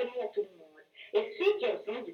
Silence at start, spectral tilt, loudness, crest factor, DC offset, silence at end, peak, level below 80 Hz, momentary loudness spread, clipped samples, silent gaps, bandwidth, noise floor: 0 s; -4.5 dB/octave; -33 LUFS; 18 dB; under 0.1%; 0 s; -16 dBFS; -84 dBFS; 11 LU; under 0.1%; none; 6.4 kHz; -57 dBFS